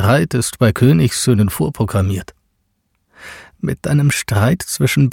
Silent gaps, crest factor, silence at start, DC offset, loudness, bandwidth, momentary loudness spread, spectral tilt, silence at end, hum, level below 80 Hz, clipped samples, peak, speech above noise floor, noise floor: none; 14 dB; 0 s; under 0.1%; -16 LUFS; 17 kHz; 13 LU; -5.5 dB/octave; 0 s; none; -40 dBFS; under 0.1%; -2 dBFS; 51 dB; -66 dBFS